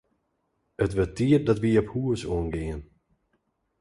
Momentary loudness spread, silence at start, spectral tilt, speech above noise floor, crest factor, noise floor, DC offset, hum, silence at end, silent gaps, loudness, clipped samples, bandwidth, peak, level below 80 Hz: 11 LU; 0.8 s; -7.5 dB/octave; 50 dB; 18 dB; -75 dBFS; under 0.1%; none; 0.95 s; none; -26 LUFS; under 0.1%; 11.5 kHz; -8 dBFS; -44 dBFS